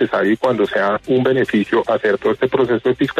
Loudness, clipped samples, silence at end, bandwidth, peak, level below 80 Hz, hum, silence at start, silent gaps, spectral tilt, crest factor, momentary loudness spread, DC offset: -17 LUFS; under 0.1%; 0 s; 9.8 kHz; -4 dBFS; -52 dBFS; none; 0 s; none; -7 dB/octave; 12 dB; 1 LU; under 0.1%